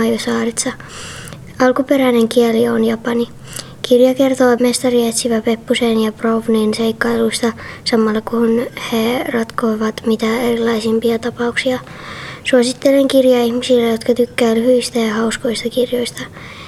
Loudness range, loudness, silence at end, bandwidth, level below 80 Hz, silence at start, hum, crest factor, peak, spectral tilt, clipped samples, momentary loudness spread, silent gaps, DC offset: 3 LU; -15 LUFS; 0 s; 15 kHz; -48 dBFS; 0 s; none; 14 dB; 0 dBFS; -4 dB/octave; under 0.1%; 11 LU; none; under 0.1%